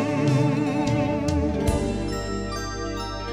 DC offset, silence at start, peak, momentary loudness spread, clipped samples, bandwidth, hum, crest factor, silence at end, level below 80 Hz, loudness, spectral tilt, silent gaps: 0.2%; 0 s; -10 dBFS; 8 LU; under 0.1%; 15.5 kHz; none; 14 dB; 0 s; -34 dBFS; -25 LUFS; -6.5 dB/octave; none